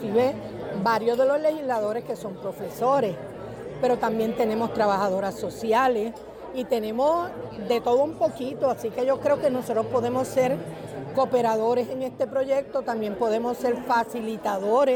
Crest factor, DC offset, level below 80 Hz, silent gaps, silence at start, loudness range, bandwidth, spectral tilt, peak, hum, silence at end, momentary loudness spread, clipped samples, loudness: 14 dB; under 0.1%; -58 dBFS; none; 0 s; 1 LU; 19.5 kHz; -6 dB/octave; -12 dBFS; none; 0 s; 11 LU; under 0.1%; -25 LUFS